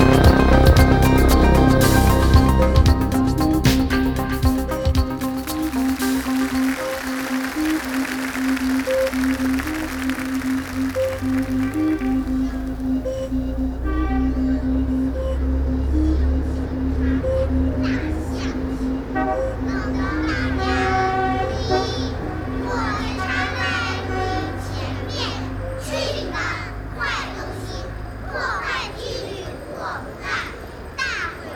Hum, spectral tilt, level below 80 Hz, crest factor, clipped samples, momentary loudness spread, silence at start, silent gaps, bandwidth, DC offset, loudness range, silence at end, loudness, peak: none; -6 dB/octave; -26 dBFS; 18 dB; under 0.1%; 12 LU; 0 s; none; 19.5 kHz; under 0.1%; 9 LU; 0 s; -21 LUFS; 0 dBFS